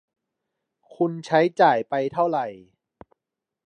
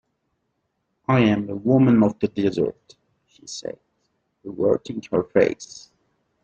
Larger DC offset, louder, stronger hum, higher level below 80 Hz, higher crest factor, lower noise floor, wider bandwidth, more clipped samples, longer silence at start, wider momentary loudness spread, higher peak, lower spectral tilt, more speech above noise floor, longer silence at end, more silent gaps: neither; about the same, -22 LUFS vs -21 LUFS; neither; second, -72 dBFS vs -58 dBFS; about the same, 20 dB vs 20 dB; first, -86 dBFS vs -74 dBFS; about the same, 9.4 kHz vs 8.6 kHz; neither; about the same, 1 s vs 1.1 s; second, 9 LU vs 21 LU; about the same, -4 dBFS vs -4 dBFS; about the same, -6.5 dB/octave vs -7 dB/octave; first, 65 dB vs 53 dB; first, 1.1 s vs 0.65 s; neither